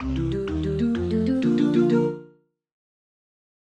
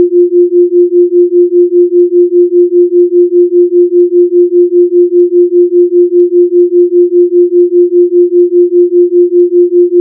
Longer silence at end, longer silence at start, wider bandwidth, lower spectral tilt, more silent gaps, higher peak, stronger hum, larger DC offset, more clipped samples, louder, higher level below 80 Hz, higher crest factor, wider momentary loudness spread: first, 1.5 s vs 0 s; about the same, 0 s vs 0 s; first, 8.4 kHz vs 0.5 kHz; second, -8.5 dB/octave vs -12 dB/octave; neither; second, -10 dBFS vs 0 dBFS; neither; neither; second, under 0.1% vs 0.4%; second, -23 LUFS vs -7 LUFS; first, -40 dBFS vs -84 dBFS; first, 16 dB vs 6 dB; first, 7 LU vs 0 LU